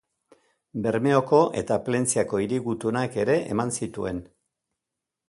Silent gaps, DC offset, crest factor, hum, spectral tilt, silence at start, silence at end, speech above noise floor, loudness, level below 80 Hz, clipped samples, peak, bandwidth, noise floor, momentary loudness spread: none; under 0.1%; 20 dB; none; -5.5 dB/octave; 0.75 s; 1.05 s; 62 dB; -25 LUFS; -56 dBFS; under 0.1%; -6 dBFS; 11.5 kHz; -86 dBFS; 10 LU